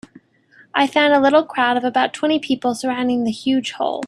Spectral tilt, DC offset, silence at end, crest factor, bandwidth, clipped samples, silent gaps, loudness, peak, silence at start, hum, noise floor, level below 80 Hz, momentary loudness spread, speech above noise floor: -4 dB/octave; under 0.1%; 0 s; 18 dB; 12 kHz; under 0.1%; none; -18 LUFS; -2 dBFS; 0.75 s; none; -52 dBFS; -62 dBFS; 7 LU; 34 dB